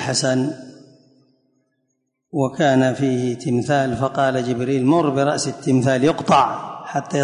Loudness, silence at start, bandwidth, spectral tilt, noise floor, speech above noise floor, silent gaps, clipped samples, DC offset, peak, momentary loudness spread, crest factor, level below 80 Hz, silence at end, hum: -19 LUFS; 0 s; 11 kHz; -5.5 dB/octave; -72 dBFS; 54 dB; none; under 0.1%; under 0.1%; -4 dBFS; 9 LU; 14 dB; -56 dBFS; 0 s; none